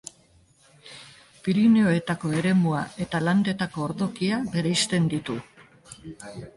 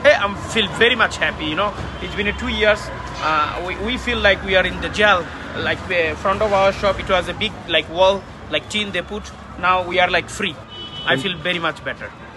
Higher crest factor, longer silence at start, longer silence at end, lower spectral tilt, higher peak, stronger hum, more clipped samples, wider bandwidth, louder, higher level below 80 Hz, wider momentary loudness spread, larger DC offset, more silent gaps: about the same, 14 dB vs 18 dB; first, 0.85 s vs 0 s; about the same, 0.05 s vs 0 s; first, -5.5 dB/octave vs -4 dB/octave; second, -10 dBFS vs -2 dBFS; neither; neither; about the same, 11.5 kHz vs 12 kHz; second, -24 LUFS vs -19 LUFS; second, -58 dBFS vs -38 dBFS; first, 23 LU vs 11 LU; neither; neither